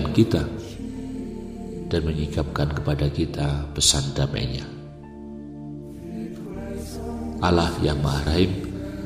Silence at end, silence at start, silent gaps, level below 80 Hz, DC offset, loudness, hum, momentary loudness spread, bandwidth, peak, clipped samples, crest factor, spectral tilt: 0 s; 0 s; none; -36 dBFS; 0.1%; -25 LUFS; none; 17 LU; 15.5 kHz; -2 dBFS; under 0.1%; 22 dB; -5 dB/octave